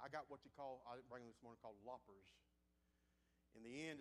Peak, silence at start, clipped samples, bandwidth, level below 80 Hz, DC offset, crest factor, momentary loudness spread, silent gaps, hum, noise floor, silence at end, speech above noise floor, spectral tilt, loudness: -36 dBFS; 0 s; under 0.1%; 11.5 kHz; -84 dBFS; under 0.1%; 22 dB; 9 LU; none; none; -83 dBFS; 0 s; 25 dB; -4.5 dB/octave; -57 LUFS